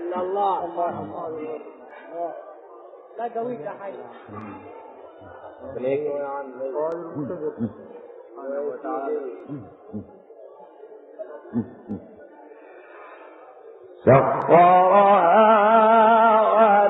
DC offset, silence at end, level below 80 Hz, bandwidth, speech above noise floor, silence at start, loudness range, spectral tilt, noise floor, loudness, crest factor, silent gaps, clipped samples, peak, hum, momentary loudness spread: under 0.1%; 0 s; -64 dBFS; 4 kHz; 23 dB; 0 s; 20 LU; -5 dB/octave; -45 dBFS; -20 LUFS; 20 dB; none; under 0.1%; -2 dBFS; none; 25 LU